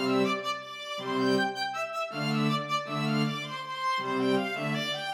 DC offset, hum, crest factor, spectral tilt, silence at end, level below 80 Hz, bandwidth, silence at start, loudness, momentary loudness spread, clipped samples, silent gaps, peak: under 0.1%; none; 16 dB; -5 dB/octave; 0 s; -88 dBFS; 16.5 kHz; 0 s; -30 LUFS; 7 LU; under 0.1%; none; -14 dBFS